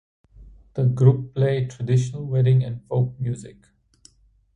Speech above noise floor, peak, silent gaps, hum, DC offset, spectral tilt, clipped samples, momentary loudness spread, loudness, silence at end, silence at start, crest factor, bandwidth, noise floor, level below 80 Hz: 35 dB; -4 dBFS; none; none; under 0.1%; -8.5 dB/octave; under 0.1%; 11 LU; -22 LUFS; 1.05 s; 0.4 s; 20 dB; 9.2 kHz; -56 dBFS; -52 dBFS